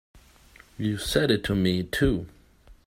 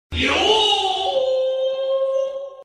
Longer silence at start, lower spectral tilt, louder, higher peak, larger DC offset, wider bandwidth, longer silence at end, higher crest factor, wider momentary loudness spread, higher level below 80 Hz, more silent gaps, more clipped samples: about the same, 0.15 s vs 0.1 s; first, -5.5 dB/octave vs -3 dB/octave; second, -25 LUFS vs -19 LUFS; second, -8 dBFS vs -4 dBFS; neither; first, 16 kHz vs 11.5 kHz; first, 0.15 s vs 0 s; about the same, 20 dB vs 16 dB; about the same, 9 LU vs 7 LU; about the same, -42 dBFS vs -46 dBFS; neither; neither